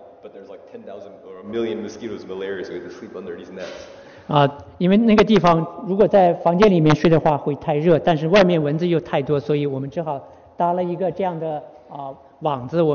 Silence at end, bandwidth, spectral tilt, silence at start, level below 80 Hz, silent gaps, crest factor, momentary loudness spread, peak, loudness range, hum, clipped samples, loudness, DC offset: 0 s; 6.8 kHz; -6 dB/octave; 0 s; -48 dBFS; none; 18 dB; 21 LU; 0 dBFS; 14 LU; none; under 0.1%; -19 LUFS; under 0.1%